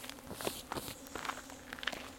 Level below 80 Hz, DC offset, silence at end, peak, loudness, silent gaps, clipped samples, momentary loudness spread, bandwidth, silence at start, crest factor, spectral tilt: -62 dBFS; under 0.1%; 0 s; -14 dBFS; -42 LUFS; none; under 0.1%; 6 LU; 17 kHz; 0 s; 30 dB; -2.5 dB/octave